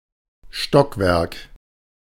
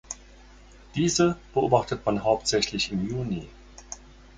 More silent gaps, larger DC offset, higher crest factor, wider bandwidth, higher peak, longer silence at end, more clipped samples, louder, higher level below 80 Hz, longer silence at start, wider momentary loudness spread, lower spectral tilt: neither; neither; about the same, 22 dB vs 22 dB; first, 16.5 kHz vs 9.6 kHz; first, 0 dBFS vs -6 dBFS; first, 0.75 s vs 0.4 s; neither; first, -19 LUFS vs -25 LUFS; first, -42 dBFS vs -50 dBFS; first, 0.55 s vs 0.1 s; second, 16 LU vs 19 LU; first, -6 dB/octave vs -4.5 dB/octave